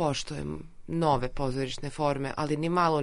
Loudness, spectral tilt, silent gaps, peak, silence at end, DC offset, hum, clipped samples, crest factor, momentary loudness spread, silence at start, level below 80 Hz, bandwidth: -30 LUFS; -6 dB/octave; none; -12 dBFS; 0 s; under 0.1%; none; under 0.1%; 16 dB; 10 LU; 0 s; -44 dBFS; 11 kHz